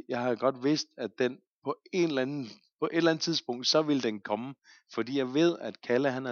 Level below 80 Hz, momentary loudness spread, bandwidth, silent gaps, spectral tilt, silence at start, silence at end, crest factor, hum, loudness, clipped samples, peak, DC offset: -84 dBFS; 12 LU; 7.2 kHz; 1.47-1.62 s, 2.72-2.79 s; -4.5 dB/octave; 0.1 s; 0 s; 18 dB; none; -30 LUFS; under 0.1%; -12 dBFS; under 0.1%